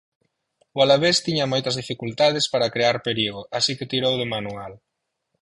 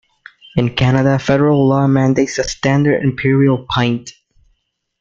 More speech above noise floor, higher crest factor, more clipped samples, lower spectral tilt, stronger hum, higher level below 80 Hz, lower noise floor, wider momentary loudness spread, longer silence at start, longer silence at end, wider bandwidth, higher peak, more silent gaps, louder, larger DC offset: about the same, 54 dB vs 51 dB; about the same, 18 dB vs 14 dB; neither; second, -4 dB/octave vs -6.5 dB/octave; neither; second, -58 dBFS vs -42 dBFS; first, -76 dBFS vs -64 dBFS; first, 12 LU vs 6 LU; first, 0.75 s vs 0.55 s; second, 0.65 s vs 0.9 s; first, 11.5 kHz vs 7.6 kHz; second, -4 dBFS vs 0 dBFS; neither; second, -21 LUFS vs -15 LUFS; neither